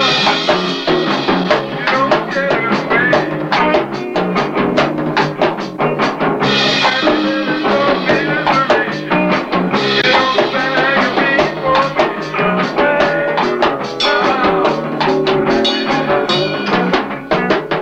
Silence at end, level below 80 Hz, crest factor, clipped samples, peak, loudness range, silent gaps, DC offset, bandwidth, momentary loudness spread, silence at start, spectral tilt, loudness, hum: 0 s; -46 dBFS; 14 dB; under 0.1%; 0 dBFS; 2 LU; none; under 0.1%; 9.4 kHz; 4 LU; 0 s; -5 dB/octave; -14 LUFS; none